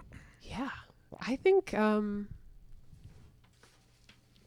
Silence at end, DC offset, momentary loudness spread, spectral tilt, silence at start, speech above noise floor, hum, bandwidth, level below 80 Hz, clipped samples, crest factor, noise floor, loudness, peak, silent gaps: 1.4 s; under 0.1%; 26 LU; -6.5 dB/octave; 0 s; 33 dB; none; 12 kHz; -56 dBFS; under 0.1%; 18 dB; -63 dBFS; -32 LUFS; -16 dBFS; none